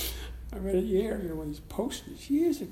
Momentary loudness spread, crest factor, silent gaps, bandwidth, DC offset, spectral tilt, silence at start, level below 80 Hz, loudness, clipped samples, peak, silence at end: 12 LU; 14 dB; none; 17 kHz; under 0.1%; -5.5 dB/octave; 0 s; -44 dBFS; -32 LUFS; under 0.1%; -16 dBFS; 0 s